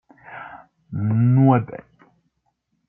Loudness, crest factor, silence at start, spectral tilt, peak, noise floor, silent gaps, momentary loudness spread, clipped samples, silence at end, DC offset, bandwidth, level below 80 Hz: -18 LUFS; 20 dB; 0.3 s; -13 dB/octave; -2 dBFS; -72 dBFS; none; 24 LU; under 0.1%; 1.1 s; under 0.1%; 3.2 kHz; -62 dBFS